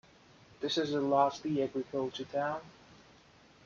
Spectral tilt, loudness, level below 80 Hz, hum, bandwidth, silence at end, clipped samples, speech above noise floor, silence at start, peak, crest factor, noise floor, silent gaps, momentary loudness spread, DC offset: -5.5 dB/octave; -33 LUFS; -72 dBFS; none; 7.4 kHz; 0.7 s; under 0.1%; 28 dB; 0.6 s; -14 dBFS; 20 dB; -61 dBFS; none; 8 LU; under 0.1%